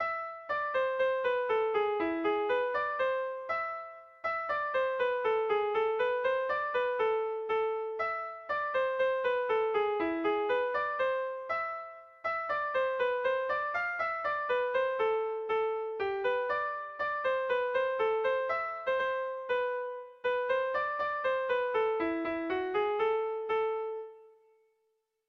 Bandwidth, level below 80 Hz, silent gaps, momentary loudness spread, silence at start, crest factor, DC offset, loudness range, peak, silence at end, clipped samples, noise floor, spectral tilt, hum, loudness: 6.2 kHz; -70 dBFS; none; 5 LU; 0 s; 12 dB; under 0.1%; 2 LU; -20 dBFS; 1 s; under 0.1%; -78 dBFS; -5 dB/octave; none; -31 LUFS